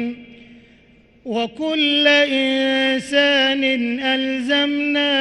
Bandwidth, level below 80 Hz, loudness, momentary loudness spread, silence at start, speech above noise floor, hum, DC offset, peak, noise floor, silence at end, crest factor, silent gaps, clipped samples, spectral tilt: 11.5 kHz; -60 dBFS; -17 LUFS; 11 LU; 0 s; 33 dB; none; under 0.1%; -2 dBFS; -51 dBFS; 0 s; 16 dB; none; under 0.1%; -3 dB/octave